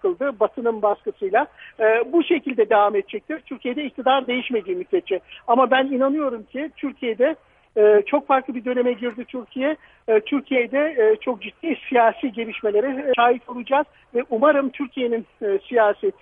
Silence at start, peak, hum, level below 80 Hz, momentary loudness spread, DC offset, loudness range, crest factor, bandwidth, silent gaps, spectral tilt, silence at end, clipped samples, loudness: 0.05 s; -4 dBFS; none; -66 dBFS; 11 LU; under 0.1%; 2 LU; 18 dB; 3.8 kHz; none; -8 dB/octave; 0.1 s; under 0.1%; -21 LUFS